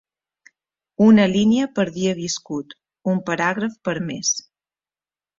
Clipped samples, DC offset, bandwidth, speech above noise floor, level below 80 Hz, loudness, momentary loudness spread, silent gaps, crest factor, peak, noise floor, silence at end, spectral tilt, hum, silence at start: under 0.1%; under 0.1%; 7.6 kHz; over 71 dB; -60 dBFS; -20 LUFS; 15 LU; none; 18 dB; -4 dBFS; under -90 dBFS; 1 s; -4.5 dB/octave; none; 1 s